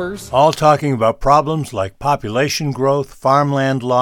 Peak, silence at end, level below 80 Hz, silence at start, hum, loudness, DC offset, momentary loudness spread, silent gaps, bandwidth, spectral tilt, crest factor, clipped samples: 0 dBFS; 0 s; -38 dBFS; 0 s; none; -16 LUFS; under 0.1%; 7 LU; none; 17 kHz; -5.5 dB/octave; 14 dB; under 0.1%